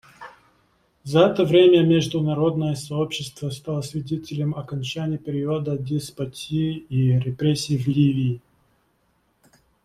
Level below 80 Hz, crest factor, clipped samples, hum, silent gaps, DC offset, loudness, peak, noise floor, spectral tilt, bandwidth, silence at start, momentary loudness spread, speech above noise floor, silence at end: -56 dBFS; 20 dB; under 0.1%; none; none; under 0.1%; -22 LUFS; -4 dBFS; -66 dBFS; -7 dB/octave; 14 kHz; 0.2 s; 13 LU; 45 dB; 1.45 s